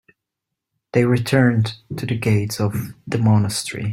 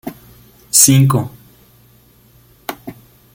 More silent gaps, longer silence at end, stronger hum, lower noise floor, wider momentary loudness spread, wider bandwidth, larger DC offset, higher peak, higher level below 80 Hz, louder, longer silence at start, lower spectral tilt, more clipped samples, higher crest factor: neither; second, 0 s vs 0.4 s; neither; first, -82 dBFS vs -49 dBFS; second, 9 LU vs 25 LU; about the same, 16 kHz vs 17 kHz; neither; about the same, -2 dBFS vs 0 dBFS; about the same, -52 dBFS vs -50 dBFS; second, -20 LUFS vs -11 LUFS; first, 0.95 s vs 0.05 s; first, -6 dB/octave vs -4 dB/octave; neither; about the same, 18 dB vs 18 dB